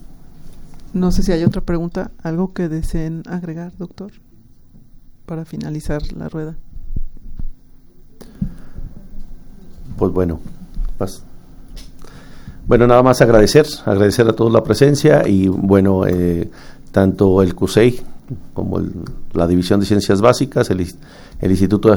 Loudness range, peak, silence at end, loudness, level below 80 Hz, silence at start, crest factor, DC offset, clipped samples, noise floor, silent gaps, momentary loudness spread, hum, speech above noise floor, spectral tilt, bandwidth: 16 LU; 0 dBFS; 0 s; -16 LUFS; -30 dBFS; 0.05 s; 16 dB; under 0.1%; under 0.1%; -43 dBFS; none; 21 LU; none; 28 dB; -7 dB/octave; over 20 kHz